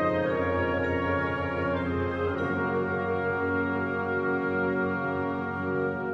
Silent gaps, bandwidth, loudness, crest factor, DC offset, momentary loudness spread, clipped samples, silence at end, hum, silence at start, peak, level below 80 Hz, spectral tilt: none; 7.2 kHz; -28 LUFS; 14 dB; under 0.1%; 2 LU; under 0.1%; 0 s; none; 0 s; -14 dBFS; -52 dBFS; -8.5 dB/octave